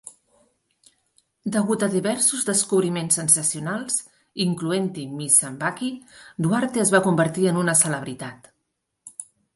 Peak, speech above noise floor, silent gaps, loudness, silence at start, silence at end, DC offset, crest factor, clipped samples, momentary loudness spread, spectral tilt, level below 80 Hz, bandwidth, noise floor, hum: -2 dBFS; 55 dB; none; -21 LUFS; 0.05 s; 0.3 s; under 0.1%; 22 dB; under 0.1%; 19 LU; -3.5 dB/octave; -66 dBFS; 12 kHz; -77 dBFS; none